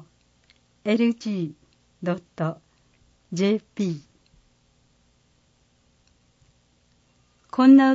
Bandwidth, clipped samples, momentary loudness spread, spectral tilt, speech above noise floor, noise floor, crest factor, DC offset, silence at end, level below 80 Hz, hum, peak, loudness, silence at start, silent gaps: 7.6 kHz; under 0.1%; 16 LU; -7 dB/octave; 44 dB; -64 dBFS; 20 dB; under 0.1%; 0 s; -68 dBFS; 60 Hz at -55 dBFS; -6 dBFS; -24 LUFS; 0.85 s; none